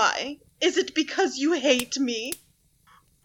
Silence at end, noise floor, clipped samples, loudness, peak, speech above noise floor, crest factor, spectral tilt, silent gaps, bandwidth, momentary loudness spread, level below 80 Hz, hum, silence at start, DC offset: 0.9 s; -61 dBFS; under 0.1%; -25 LUFS; -8 dBFS; 35 dB; 20 dB; -1.5 dB/octave; none; 19 kHz; 11 LU; -66 dBFS; none; 0 s; under 0.1%